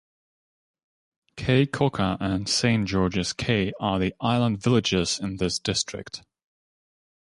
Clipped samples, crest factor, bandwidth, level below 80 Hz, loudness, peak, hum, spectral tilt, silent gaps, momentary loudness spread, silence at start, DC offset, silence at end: under 0.1%; 18 dB; 11.5 kHz; -48 dBFS; -24 LUFS; -8 dBFS; none; -5 dB/octave; none; 5 LU; 1.35 s; under 0.1%; 1.2 s